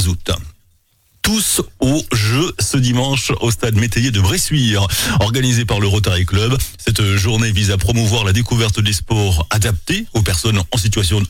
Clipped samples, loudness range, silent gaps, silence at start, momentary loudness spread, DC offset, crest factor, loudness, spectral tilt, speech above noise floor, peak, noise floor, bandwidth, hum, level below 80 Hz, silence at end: under 0.1%; 1 LU; none; 0 s; 3 LU; under 0.1%; 10 dB; -16 LUFS; -4.5 dB/octave; 41 dB; -4 dBFS; -56 dBFS; 17 kHz; none; -30 dBFS; 0 s